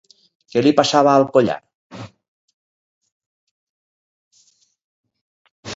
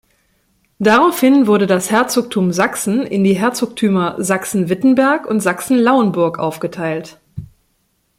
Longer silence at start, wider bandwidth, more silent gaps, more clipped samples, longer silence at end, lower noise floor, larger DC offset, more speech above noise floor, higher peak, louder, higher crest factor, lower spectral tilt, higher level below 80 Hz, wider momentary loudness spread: second, 0.55 s vs 0.8 s; second, 7.8 kHz vs 16.5 kHz; first, 1.75-1.90 s, 2.28-2.48 s, 2.54-3.01 s, 3.12-3.20 s, 3.26-4.31 s, 4.84-5.04 s, 5.21-5.45 s, 5.51-5.63 s vs none; neither; second, 0 s vs 0.75 s; second, -59 dBFS vs -63 dBFS; neither; second, 44 dB vs 49 dB; about the same, 0 dBFS vs 0 dBFS; about the same, -16 LUFS vs -15 LUFS; first, 22 dB vs 14 dB; about the same, -5 dB/octave vs -5 dB/octave; second, -62 dBFS vs -56 dBFS; first, 24 LU vs 11 LU